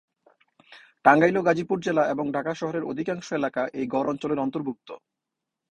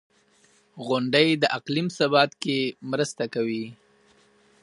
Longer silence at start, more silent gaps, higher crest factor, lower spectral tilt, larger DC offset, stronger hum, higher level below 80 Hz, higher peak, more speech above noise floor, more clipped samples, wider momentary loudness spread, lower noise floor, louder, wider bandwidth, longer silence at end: about the same, 0.7 s vs 0.75 s; neither; about the same, 24 dB vs 22 dB; first, -6.5 dB/octave vs -5 dB/octave; neither; neither; first, -66 dBFS vs -74 dBFS; about the same, -2 dBFS vs -4 dBFS; first, 61 dB vs 37 dB; neither; first, 13 LU vs 9 LU; first, -85 dBFS vs -61 dBFS; about the same, -25 LUFS vs -24 LUFS; second, 10 kHz vs 11.5 kHz; second, 0.75 s vs 0.9 s